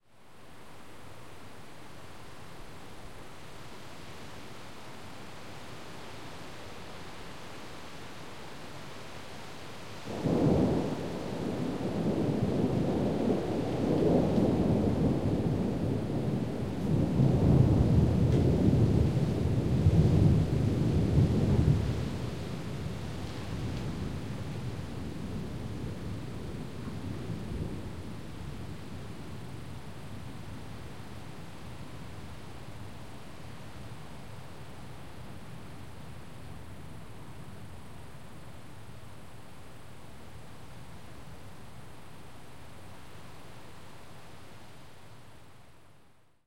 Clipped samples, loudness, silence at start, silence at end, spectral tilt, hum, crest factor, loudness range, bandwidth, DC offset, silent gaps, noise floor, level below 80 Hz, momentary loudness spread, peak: under 0.1%; -30 LUFS; 0 s; 0 s; -8 dB/octave; none; 22 dB; 23 LU; 16 kHz; 0.7%; none; -62 dBFS; -46 dBFS; 23 LU; -10 dBFS